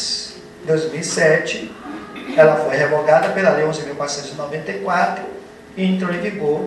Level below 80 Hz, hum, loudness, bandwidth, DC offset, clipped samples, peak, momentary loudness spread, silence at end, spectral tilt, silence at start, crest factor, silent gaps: -56 dBFS; none; -18 LUFS; 12 kHz; under 0.1%; under 0.1%; 0 dBFS; 17 LU; 0 s; -4.5 dB/octave; 0 s; 18 dB; none